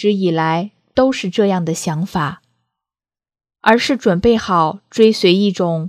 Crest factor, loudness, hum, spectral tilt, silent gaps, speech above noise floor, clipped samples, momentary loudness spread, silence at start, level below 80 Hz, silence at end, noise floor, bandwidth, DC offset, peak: 16 dB; -16 LUFS; none; -5.5 dB/octave; none; over 75 dB; under 0.1%; 7 LU; 0 s; -46 dBFS; 0 s; under -90 dBFS; 14.5 kHz; under 0.1%; 0 dBFS